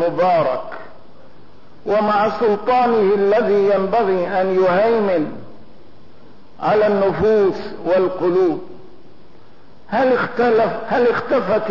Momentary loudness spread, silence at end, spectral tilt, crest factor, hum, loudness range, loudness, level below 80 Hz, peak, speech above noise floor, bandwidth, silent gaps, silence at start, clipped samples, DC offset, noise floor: 9 LU; 0 s; -8 dB/octave; 10 dB; none; 3 LU; -17 LUFS; -52 dBFS; -8 dBFS; 32 dB; 6 kHz; none; 0 s; under 0.1%; 2%; -48 dBFS